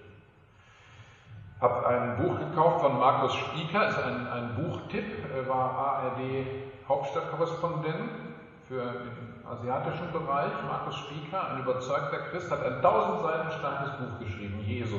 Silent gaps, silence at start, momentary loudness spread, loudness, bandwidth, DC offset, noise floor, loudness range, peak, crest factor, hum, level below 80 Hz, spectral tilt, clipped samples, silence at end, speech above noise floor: none; 0 s; 13 LU; -30 LUFS; 7.6 kHz; under 0.1%; -58 dBFS; 7 LU; -10 dBFS; 20 dB; none; -62 dBFS; -7 dB/octave; under 0.1%; 0 s; 28 dB